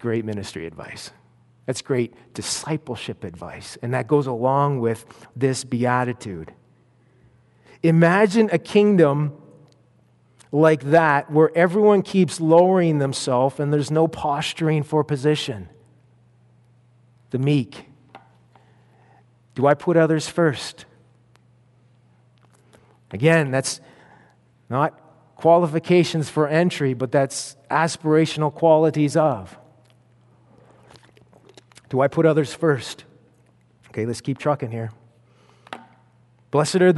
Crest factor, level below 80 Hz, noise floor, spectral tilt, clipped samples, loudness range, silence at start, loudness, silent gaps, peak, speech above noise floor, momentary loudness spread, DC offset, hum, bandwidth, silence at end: 20 dB; -62 dBFS; -58 dBFS; -6 dB/octave; under 0.1%; 10 LU; 0 s; -20 LUFS; none; -2 dBFS; 38 dB; 18 LU; under 0.1%; none; 11.5 kHz; 0 s